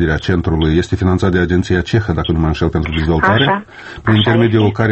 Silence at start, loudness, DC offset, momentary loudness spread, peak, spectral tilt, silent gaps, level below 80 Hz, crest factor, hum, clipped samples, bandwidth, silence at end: 0 s; -14 LUFS; under 0.1%; 5 LU; 0 dBFS; -7 dB/octave; none; -28 dBFS; 14 dB; none; under 0.1%; 8.4 kHz; 0 s